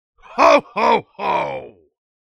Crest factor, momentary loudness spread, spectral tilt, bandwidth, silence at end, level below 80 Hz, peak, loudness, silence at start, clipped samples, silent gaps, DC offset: 18 dB; 15 LU; -4 dB/octave; 12.5 kHz; 0.55 s; -56 dBFS; 0 dBFS; -17 LUFS; 0.3 s; under 0.1%; none; under 0.1%